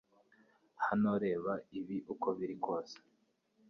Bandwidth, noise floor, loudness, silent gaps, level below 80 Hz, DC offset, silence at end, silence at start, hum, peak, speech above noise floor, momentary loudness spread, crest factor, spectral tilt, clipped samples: 6.6 kHz; -76 dBFS; -37 LUFS; none; -76 dBFS; under 0.1%; 0.7 s; 0.8 s; none; -22 dBFS; 39 dB; 9 LU; 16 dB; -6 dB/octave; under 0.1%